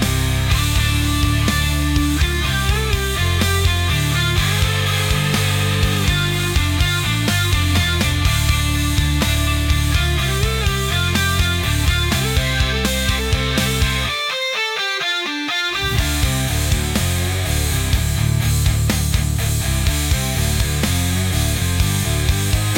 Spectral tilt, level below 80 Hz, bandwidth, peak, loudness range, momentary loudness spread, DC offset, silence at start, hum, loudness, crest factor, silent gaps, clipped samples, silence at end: -4 dB/octave; -24 dBFS; 17 kHz; -4 dBFS; 1 LU; 2 LU; under 0.1%; 0 s; none; -18 LUFS; 12 dB; none; under 0.1%; 0 s